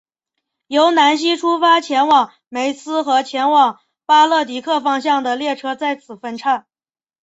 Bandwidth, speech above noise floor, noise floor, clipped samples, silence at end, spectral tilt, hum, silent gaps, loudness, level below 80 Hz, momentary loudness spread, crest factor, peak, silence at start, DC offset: 8 kHz; over 74 dB; under -90 dBFS; under 0.1%; 0.6 s; -2 dB/octave; none; none; -16 LUFS; -68 dBFS; 10 LU; 16 dB; -2 dBFS; 0.7 s; under 0.1%